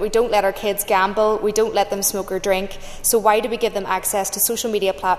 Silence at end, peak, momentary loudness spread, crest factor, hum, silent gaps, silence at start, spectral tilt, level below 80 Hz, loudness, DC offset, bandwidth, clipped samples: 0 s; -2 dBFS; 5 LU; 16 dB; none; none; 0 s; -2.5 dB/octave; -40 dBFS; -19 LUFS; under 0.1%; 14 kHz; under 0.1%